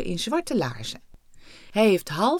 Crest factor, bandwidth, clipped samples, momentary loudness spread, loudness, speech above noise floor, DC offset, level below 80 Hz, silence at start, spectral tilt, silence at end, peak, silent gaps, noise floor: 18 dB; 19 kHz; under 0.1%; 15 LU; -24 LUFS; 24 dB; under 0.1%; -48 dBFS; 0 s; -5 dB/octave; 0 s; -8 dBFS; none; -48 dBFS